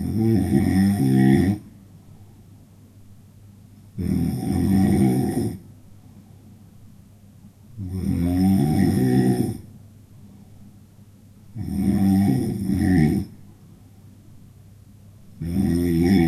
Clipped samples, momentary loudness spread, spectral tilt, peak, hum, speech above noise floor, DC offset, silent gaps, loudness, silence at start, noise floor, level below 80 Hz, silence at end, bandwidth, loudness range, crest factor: under 0.1%; 13 LU; -8 dB/octave; -4 dBFS; none; 30 dB; under 0.1%; none; -21 LUFS; 0 s; -48 dBFS; -46 dBFS; 0 s; 14 kHz; 4 LU; 18 dB